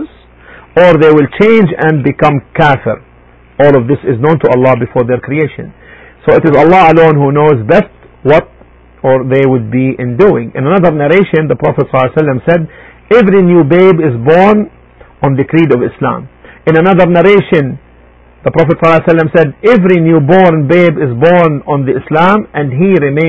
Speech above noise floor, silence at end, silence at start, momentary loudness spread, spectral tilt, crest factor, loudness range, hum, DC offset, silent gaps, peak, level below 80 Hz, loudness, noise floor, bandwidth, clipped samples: 33 dB; 0 s; 0 s; 9 LU; -9 dB/octave; 8 dB; 2 LU; none; 0.6%; none; 0 dBFS; -38 dBFS; -8 LUFS; -40 dBFS; 8 kHz; 1%